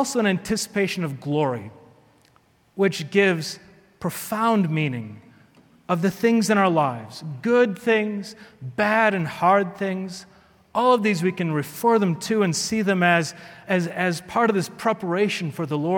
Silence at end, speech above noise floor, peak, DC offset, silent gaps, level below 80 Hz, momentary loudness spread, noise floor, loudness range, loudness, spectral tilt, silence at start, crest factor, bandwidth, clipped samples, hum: 0 s; 38 dB; -4 dBFS; under 0.1%; none; -62 dBFS; 14 LU; -60 dBFS; 4 LU; -22 LUFS; -5 dB/octave; 0 s; 18 dB; 19 kHz; under 0.1%; none